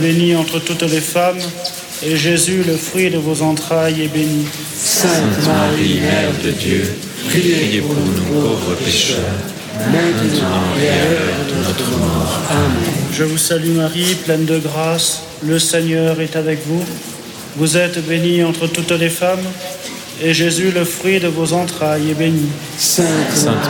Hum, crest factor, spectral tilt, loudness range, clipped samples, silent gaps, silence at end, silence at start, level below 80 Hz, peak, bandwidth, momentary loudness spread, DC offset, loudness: none; 12 dB; -4 dB/octave; 2 LU; under 0.1%; none; 0 s; 0 s; -44 dBFS; -2 dBFS; 17.5 kHz; 7 LU; under 0.1%; -15 LUFS